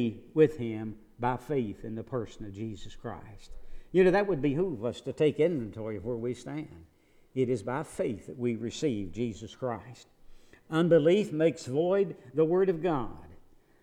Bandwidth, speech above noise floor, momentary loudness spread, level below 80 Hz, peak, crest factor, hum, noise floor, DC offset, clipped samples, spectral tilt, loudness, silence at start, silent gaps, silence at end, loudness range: 11 kHz; 26 dB; 16 LU; -52 dBFS; -10 dBFS; 20 dB; none; -55 dBFS; under 0.1%; under 0.1%; -7 dB/octave; -30 LUFS; 0 s; none; 0.45 s; 7 LU